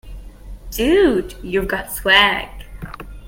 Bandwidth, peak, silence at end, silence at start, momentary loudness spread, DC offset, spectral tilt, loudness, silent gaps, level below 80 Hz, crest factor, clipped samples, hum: 17 kHz; 0 dBFS; 0 s; 0.05 s; 22 LU; under 0.1%; -3.5 dB/octave; -16 LUFS; none; -34 dBFS; 20 dB; under 0.1%; none